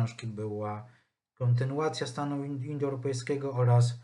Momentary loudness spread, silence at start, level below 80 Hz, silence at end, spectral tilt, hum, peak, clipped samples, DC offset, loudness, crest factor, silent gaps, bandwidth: 11 LU; 0 s; -74 dBFS; 0 s; -7 dB/octave; none; -14 dBFS; under 0.1%; under 0.1%; -31 LUFS; 16 dB; none; 10.5 kHz